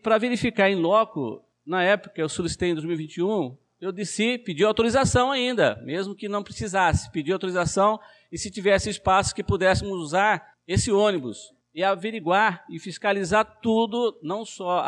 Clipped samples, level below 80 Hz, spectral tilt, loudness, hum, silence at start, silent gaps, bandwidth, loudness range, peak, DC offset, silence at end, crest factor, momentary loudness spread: under 0.1%; -46 dBFS; -4.5 dB/octave; -24 LUFS; none; 0.05 s; none; 11.5 kHz; 2 LU; -8 dBFS; under 0.1%; 0 s; 16 dB; 11 LU